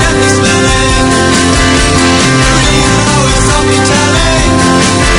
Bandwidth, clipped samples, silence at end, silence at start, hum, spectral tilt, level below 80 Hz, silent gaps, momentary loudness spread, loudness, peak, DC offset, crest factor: 16 kHz; 0.9%; 0 s; 0 s; none; -4 dB/octave; -18 dBFS; none; 1 LU; -7 LUFS; 0 dBFS; under 0.1%; 8 dB